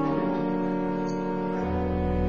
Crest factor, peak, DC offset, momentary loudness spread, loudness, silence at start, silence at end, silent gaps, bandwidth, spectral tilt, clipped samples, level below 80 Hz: 12 dB; -14 dBFS; 0.6%; 2 LU; -28 LUFS; 0 s; 0 s; none; 7 kHz; -9 dB/octave; under 0.1%; -38 dBFS